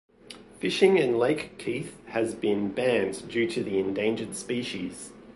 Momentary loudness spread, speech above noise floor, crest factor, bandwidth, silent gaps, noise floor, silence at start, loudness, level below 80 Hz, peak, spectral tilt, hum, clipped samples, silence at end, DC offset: 13 LU; 22 dB; 20 dB; 11.5 kHz; none; -48 dBFS; 0.3 s; -27 LUFS; -62 dBFS; -8 dBFS; -5 dB/octave; none; under 0.1%; 0.05 s; under 0.1%